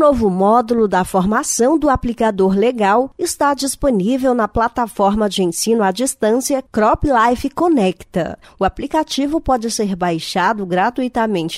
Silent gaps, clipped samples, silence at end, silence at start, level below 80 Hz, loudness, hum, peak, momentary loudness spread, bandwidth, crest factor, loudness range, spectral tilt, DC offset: none; under 0.1%; 0 s; 0 s; -36 dBFS; -16 LUFS; none; -2 dBFS; 5 LU; 16 kHz; 14 dB; 3 LU; -4.5 dB/octave; under 0.1%